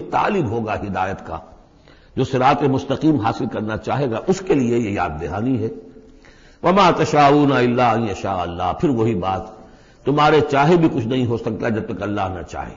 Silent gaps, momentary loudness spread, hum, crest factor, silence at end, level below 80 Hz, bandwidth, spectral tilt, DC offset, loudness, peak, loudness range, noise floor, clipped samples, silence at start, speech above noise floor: none; 11 LU; none; 16 dB; 0 s; -44 dBFS; 7.6 kHz; -7 dB/octave; under 0.1%; -19 LUFS; -2 dBFS; 4 LU; -48 dBFS; under 0.1%; 0 s; 30 dB